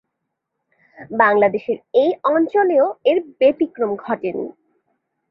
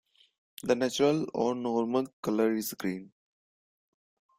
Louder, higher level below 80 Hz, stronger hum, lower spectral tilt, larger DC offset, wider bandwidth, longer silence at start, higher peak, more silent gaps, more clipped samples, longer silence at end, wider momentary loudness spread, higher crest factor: first, -18 LUFS vs -30 LUFS; about the same, -66 dBFS vs -70 dBFS; neither; first, -8.5 dB/octave vs -5 dB/octave; neither; second, 5.8 kHz vs 16 kHz; first, 1 s vs 0.65 s; first, -2 dBFS vs -12 dBFS; second, none vs 2.13-2.23 s; neither; second, 0.8 s vs 1.3 s; about the same, 10 LU vs 9 LU; about the same, 16 dB vs 18 dB